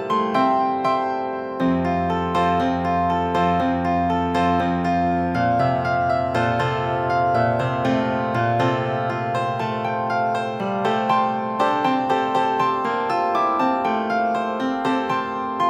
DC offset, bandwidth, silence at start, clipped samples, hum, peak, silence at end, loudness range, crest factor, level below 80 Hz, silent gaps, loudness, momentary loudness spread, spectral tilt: under 0.1%; 10.5 kHz; 0 s; under 0.1%; none; -6 dBFS; 0 s; 2 LU; 14 dB; -48 dBFS; none; -21 LUFS; 4 LU; -7 dB/octave